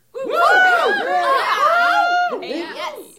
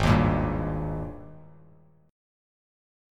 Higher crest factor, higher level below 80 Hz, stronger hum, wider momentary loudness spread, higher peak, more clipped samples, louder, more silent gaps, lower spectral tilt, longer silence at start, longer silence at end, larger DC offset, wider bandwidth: second, 14 dB vs 22 dB; second, -68 dBFS vs -38 dBFS; neither; second, 13 LU vs 22 LU; first, -2 dBFS vs -6 dBFS; neither; first, -16 LUFS vs -27 LUFS; neither; second, -1.5 dB/octave vs -7.5 dB/octave; first, 0.15 s vs 0 s; second, 0.15 s vs 1.7 s; neither; first, 16.5 kHz vs 12 kHz